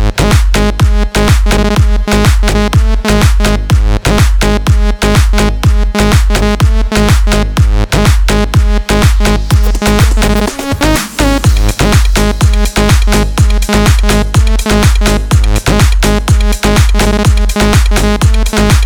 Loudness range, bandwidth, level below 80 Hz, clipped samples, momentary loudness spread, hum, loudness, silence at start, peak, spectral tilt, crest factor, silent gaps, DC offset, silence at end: 1 LU; 19 kHz; -10 dBFS; 0.4%; 2 LU; none; -10 LUFS; 0 s; 0 dBFS; -5 dB/octave; 8 dB; none; under 0.1%; 0 s